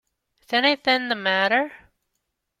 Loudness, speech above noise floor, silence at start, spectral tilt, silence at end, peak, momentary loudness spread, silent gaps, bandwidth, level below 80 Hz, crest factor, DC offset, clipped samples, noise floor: -21 LUFS; 56 dB; 0.5 s; -4 dB/octave; 0.85 s; -4 dBFS; 5 LU; none; 16 kHz; -70 dBFS; 20 dB; under 0.1%; under 0.1%; -78 dBFS